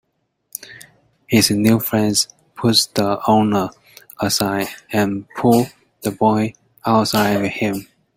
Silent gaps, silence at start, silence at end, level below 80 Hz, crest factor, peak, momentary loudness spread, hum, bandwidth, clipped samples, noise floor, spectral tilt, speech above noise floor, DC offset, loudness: none; 0.6 s; 0.35 s; -52 dBFS; 18 dB; 0 dBFS; 12 LU; none; 16.5 kHz; under 0.1%; -62 dBFS; -4.5 dB/octave; 45 dB; under 0.1%; -18 LUFS